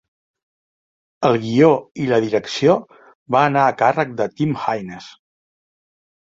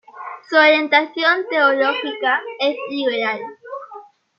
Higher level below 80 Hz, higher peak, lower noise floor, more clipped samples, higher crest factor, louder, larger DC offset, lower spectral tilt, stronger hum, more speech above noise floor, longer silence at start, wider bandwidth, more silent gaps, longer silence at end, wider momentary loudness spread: first, -60 dBFS vs -80 dBFS; about the same, -2 dBFS vs -2 dBFS; first, under -90 dBFS vs -41 dBFS; neither; about the same, 18 dB vs 18 dB; about the same, -18 LUFS vs -17 LUFS; neither; first, -6.5 dB/octave vs -4 dB/octave; neither; first, over 73 dB vs 23 dB; first, 1.2 s vs 0.15 s; first, 7.8 kHz vs 7 kHz; first, 1.91-1.95 s, 3.15-3.26 s vs none; first, 1.2 s vs 0.35 s; second, 9 LU vs 20 LU